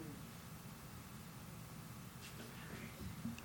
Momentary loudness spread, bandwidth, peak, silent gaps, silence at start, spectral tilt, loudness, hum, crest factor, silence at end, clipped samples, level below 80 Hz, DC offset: 4 LU; over 20 kHz; -34 dBFS; none; 0 s; -4.5 dB/octave; -52 LUFS; none; 18 dB; 0 s; under 0.1%; -64 dBFS; under 0.1%